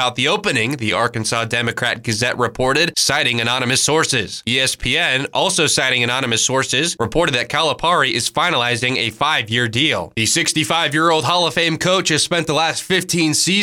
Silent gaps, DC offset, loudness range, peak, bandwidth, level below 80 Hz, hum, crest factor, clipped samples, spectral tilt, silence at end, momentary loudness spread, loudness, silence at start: none; under 0.1%; 1 LU; -4 dBFS; 19 kHz; -44 dBFS; none; 14 dB; under 0.1%; -2.5 dB/octave; 0 s; 4 LU; -16 LUFS; 0 s